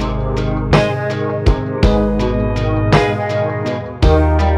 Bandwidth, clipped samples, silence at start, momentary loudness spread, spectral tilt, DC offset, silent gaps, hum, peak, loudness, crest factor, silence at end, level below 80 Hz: 9.8 kHz; under 0.1%; 0 s; 6 LU; -7.5 dB/octave; under 0.1%; none; none; 0 dBFS; -16 LUFS; 14 dB; 0 s; -20 dBFS